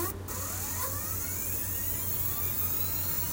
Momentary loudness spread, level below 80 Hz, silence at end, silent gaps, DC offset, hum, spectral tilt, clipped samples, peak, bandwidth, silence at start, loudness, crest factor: 5 LU; -50 dBFS; 0 s; none; under 0.1%; none; -3 dB/octave; under 0.1%; -18 dBFS; 16 kHz; 0 s; -29 LUFS; 14 dB